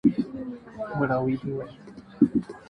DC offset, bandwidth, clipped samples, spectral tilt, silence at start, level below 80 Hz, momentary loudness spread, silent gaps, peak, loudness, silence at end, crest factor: under 0.1%; 5.6 kHz; under 0.1%; -9.5 dB/octave; 0.05 s; -56 dBFS; 17 LU; none; -6 dBFS; -27 LUFS; 0.05 s; 22 dB